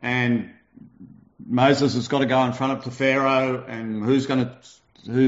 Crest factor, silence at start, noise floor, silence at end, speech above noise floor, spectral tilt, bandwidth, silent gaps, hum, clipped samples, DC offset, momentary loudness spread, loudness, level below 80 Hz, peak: 18 dB; 0 s; -48 dBFS; 0 s; 26 dB; -5 dB/octave; 7.8 kHz; none; none; under 0.1%; under 0.1%; 9 LU; -22 LUFS; -62 dBFS; -4 dBFS